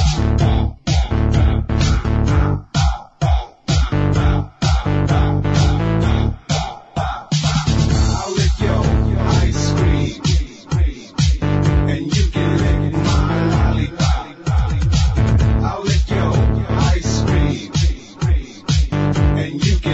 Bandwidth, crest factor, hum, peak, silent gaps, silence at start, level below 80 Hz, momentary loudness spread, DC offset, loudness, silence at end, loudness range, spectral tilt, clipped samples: 8.2 kHz; 14 dB; none; -2 dBFS; none; 0 s; -20 dBFS; 4 LU; under 0.1%; -17 LUFS; 0 s; 1 LU; -6 dB/octave; under 0.1%